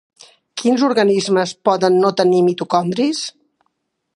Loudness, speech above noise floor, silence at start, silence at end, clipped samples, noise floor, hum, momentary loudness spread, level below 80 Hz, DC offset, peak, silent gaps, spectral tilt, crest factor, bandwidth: -16 LUFS; 55 dB; 0.55 s; 0.85 s; under 0.1%; -70 dBFS; none; 7 LU; -68 dBFS; under 0.1%; -2 dBFS; none; -5 dB/octave; 16 dB; 11.5 kHz